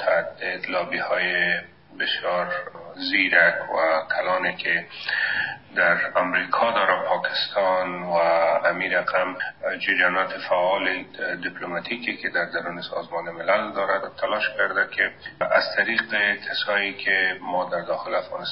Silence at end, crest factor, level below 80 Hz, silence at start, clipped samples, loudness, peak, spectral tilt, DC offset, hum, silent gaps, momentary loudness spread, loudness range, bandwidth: 0 s; 20 dB; -70 dBFS; 0 s; under 0.1%; -23 LUFS; -4 dBFS; 0 dB/octave; 0.1%; none; none; 9 LU; 4 LU; 5.8 kHz